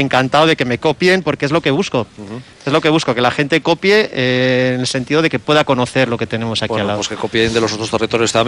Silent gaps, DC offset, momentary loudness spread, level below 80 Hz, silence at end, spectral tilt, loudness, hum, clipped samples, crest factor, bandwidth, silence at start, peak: none; under 0.1%; 6 LU; -48 dBFS; 0 s; -4.5 dB/octave; -15 LUFS; none; under 0.1%; 14 dB; 13 kHz; 0 s; -2 dBFS